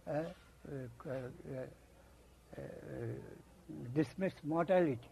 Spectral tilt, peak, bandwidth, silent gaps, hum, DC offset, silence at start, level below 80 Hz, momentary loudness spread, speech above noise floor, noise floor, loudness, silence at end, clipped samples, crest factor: -8 dB/octave; -20 dBFS; 13.5 kHz; none; none; under 0.1%; 0.05 s; -66 dBFS; 20 LU; 23 dB; -62 dBFS; -40 LUFS; 0 s; under 0.1%; 22 dB